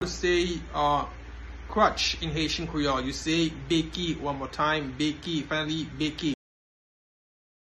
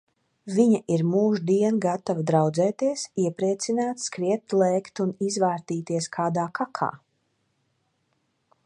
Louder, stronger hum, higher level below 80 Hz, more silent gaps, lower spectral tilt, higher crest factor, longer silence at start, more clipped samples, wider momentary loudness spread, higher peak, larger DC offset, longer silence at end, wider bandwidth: second, -28 LUFS vs -25 LUFS; neither; first, -44 dBFS vs -72 dBFS; neither; second, -4.5 dB/octave vs -6 dB/octave; about the same, 20 dB vs 18 dB; second, 0 s vs 0.45 s; neither; about the same, 8 LU vs 7 LU; second, -10 dBFS vs -6 dBFS; neither; second, 1.35 s vs 1.7 s; about the same, 12 kHz vs 11 kHz